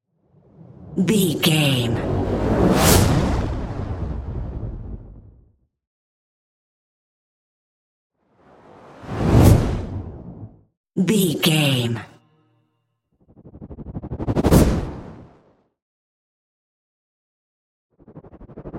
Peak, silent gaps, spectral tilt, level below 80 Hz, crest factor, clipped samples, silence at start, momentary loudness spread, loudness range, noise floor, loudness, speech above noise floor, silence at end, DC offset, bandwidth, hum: 0 dBFS; 5.87-8.10 s, 10.77-10.84 s, 15.82-17.89 s; -5.5 dB/octave; -32 dBFS; 22 dB; under 0.1%; 0.8 s; 23 LU; 15 LU; -71 dBFS; -19 LUFS; 52 dB; 0 s; under 0.1%; 16 kHz; none